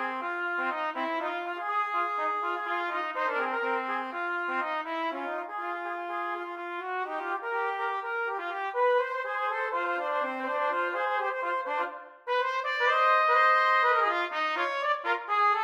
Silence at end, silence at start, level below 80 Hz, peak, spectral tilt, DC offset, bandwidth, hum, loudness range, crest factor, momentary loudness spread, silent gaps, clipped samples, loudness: 0 s; 0 s; -86 dBFS; -12 dBFS; -1.5 dB/octave; under 0.1%; 13.5 kHz; none; 8 LU; 16 dB; 10 LU; none; under 0.1%; -29 LUFS